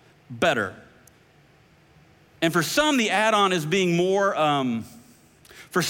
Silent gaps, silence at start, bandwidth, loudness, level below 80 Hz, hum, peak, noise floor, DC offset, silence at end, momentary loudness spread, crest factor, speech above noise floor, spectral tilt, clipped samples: none; 0.3 s; 17 kHz; -22 LUFS; -62 dBFS; none; -8 dBFS; -56 dBFS; under 0.1%; 0 s; 10 LU; 16 dB; 34 dB; -4 dB/octave; under 0.1%